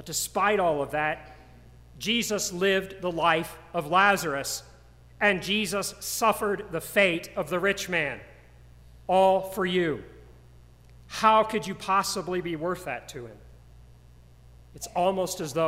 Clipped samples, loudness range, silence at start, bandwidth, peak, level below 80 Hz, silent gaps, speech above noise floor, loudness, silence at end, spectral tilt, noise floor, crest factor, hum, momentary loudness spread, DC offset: under 0.1%; 4 LU; 0 s; 16 kHz; -8 dBFS; -54 dBFS; none; 26 dB; -26 LUFS; 0 s; -3.5 dB/octave; -52 dBFS; 20 dB; none; 12 LU; under 0.1%